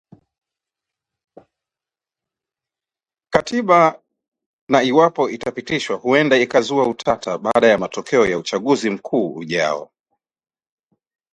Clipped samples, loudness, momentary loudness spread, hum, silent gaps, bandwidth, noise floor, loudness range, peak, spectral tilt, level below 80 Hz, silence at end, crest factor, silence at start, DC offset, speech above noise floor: under 0.1%; -18 LUFS; 8 LU; none; 4.28-4.32 s, 4.46-4.67 s; 11 kHz; under -90 dBFS; 4 LU; 0 dBFS; -5 dB/octave; -56 dBFS; 1.5 s; 20 dB; 3.3 s; under 0.1%; over 73 dB